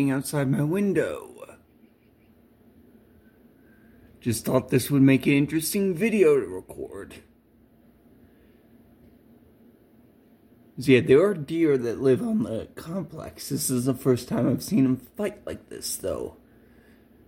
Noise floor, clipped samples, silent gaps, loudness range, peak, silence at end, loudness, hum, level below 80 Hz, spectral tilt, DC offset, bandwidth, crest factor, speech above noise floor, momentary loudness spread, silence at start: -58 dBFS; under 0.1%; none; 10 LU; -4 dBFS; 0.95 s; -24 LUFS; none; -60 dBFS; -6 dB/octave; under 0.1%; 16.5 kHz; 22 dB; 35 dB; 18 LU; 0 s